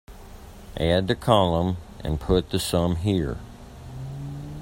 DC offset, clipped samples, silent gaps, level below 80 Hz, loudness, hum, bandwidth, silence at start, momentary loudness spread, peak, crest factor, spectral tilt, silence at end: under 0.1%; under 0.1%; none; -40 dBFS; -24 LUFS; none; 16.5 kHz; 0.1 s; 23 LU; -2 dBFS; 22 dB; -6 dB/octave; 0 s